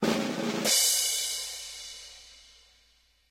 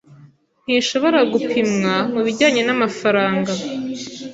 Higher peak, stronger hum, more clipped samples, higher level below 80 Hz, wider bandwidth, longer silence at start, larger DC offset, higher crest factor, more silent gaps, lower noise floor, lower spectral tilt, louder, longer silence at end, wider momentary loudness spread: second, -12 dBFS vs -2 dBFS; neither; neither; about the same, -66 dBFS vs -62 dBFS; first, 16.5 kHz vs 8 kHz; about the same, 0 s vs 0.1 s; neither; about the same, 18 dB vs 16 dB; neither; first, -65 dBFS vs -49 dBFS; second, -1.5 dB/octave vs -4.5 dB/octave; second, -26 LUFS vs -18 LUFS; first, 0.9 s vs 0 s; first, 22 LU vs 10 LU